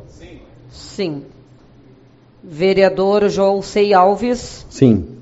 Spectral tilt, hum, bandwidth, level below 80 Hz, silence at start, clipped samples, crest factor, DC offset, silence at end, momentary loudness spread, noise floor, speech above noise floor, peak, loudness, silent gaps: -5.5 dB/octave; none; 8 kHz; -44 dBFS; 0.2 s; under 0.1%; 16 dB; under 0.1%; 0.05 s; 19 LU; -47 dBFS; 32 dB; 0 dBFS; -15 LUFS; none